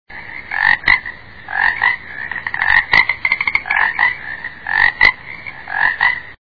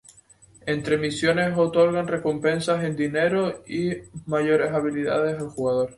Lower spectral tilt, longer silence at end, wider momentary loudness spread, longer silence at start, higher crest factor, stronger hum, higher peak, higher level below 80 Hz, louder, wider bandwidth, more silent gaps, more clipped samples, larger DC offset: second, -3.5 dB/octave vs -6 dB/octave; about the same, 0.05 s vs 0 s; first, 17 LU vs 7 LU; second, 0.1 s vs 0.65 s; about the same, 18 dB vs 18 dB; neither; first, 0 dBFS vs -6 dBFS; first, -42 dBFS vs -58 dBFS; first, -14 LUFS vs -23 LUFS; second, 5.4 kHz vs 11.5 kHz; neither; first, 0.1% vs under 0.1%; neither